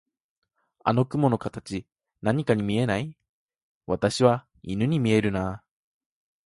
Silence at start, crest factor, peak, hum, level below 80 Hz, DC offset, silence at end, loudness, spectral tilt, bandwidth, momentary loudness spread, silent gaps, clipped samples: 0.85 s; 22 dB; -6 dBFS; none; -54 dBFS; under 0.1%; 0.9 s; -25 LUFS; -6.5 dB/octave; 11.5 kHz; 13 LU; 3.29-3.49 s, 3.62-3.81 s; under 0.1%